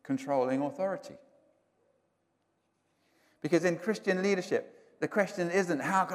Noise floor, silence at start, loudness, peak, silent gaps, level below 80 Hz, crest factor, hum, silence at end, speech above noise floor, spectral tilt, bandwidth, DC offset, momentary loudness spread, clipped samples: -77 dBFS; 0.05 s; -31 LUFS; -12 dBFS; none; -84 dBFS; 20 dB; none; 0 s; 46 dB; -5.5 dB/octave; 15.5 kHz; under 0.1%; 8 LU; under 0.1%